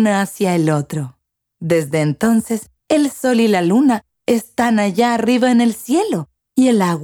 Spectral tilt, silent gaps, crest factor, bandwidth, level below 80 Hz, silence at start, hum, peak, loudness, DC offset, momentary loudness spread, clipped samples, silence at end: -6 dB/octave; none; 14 dB; 18.5 kHz; -58 dBFS; 0 s; none; -2 dBFS; -16 LUFS; under 0.1%; 10 LU; under 0.1%; 0 s